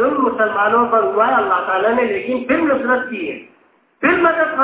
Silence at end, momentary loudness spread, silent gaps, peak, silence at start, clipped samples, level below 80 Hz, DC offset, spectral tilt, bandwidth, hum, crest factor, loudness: 0 s; 7 LU; none; -2 dBFS; 0 s; under 0.1%; -54 dBFS; under 0.1%; -8.5 dB/octave; 4 kHz; none; 16 dB; -16 LUFS